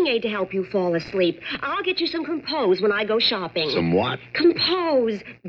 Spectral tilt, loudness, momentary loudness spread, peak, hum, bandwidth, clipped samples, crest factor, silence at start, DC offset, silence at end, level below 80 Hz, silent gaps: -7 dB/octave; -22 LUFS; 6 LU; -8 dBFS; none; 6.4 kHz; under 0.1%; 14 dB; 0 s; under 0.1%; 0 s; -58 dBFS; none